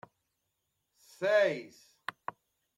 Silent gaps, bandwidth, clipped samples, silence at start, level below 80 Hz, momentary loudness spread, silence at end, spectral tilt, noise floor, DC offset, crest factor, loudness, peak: none; 13.5 kHz; under 0.1%; 1.2 s; -88 dBFS; 18 LU; 1.1 s; -4.5 dB/octave; -82 dBFS; under 0.1%; 20 dB; -31 LUFS; -16 dBFS